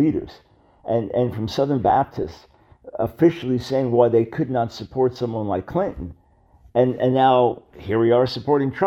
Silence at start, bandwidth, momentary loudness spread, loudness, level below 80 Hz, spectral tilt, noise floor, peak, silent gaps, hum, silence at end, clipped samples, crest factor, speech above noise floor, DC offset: 0 s; 13.5 kHz; 13 LU; -21 LUFS; -48 dBFS; -8 dB/octave; -53 dBFS; -4 dBFS; none; none; 0 s; under 0.1%; 18 dB; 33 dB; under 0.1%